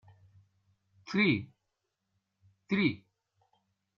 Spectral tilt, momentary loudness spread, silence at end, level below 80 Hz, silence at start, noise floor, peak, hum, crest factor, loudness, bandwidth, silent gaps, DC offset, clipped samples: -4.5 dB/octave; 17 LU; 1 s; -72 dBFS; 1.05 s; -84 dBFS; -16 dBFS; none; 20 dB; -30 LUFS; 7 kHz; none; under 0.1%; under 0.1%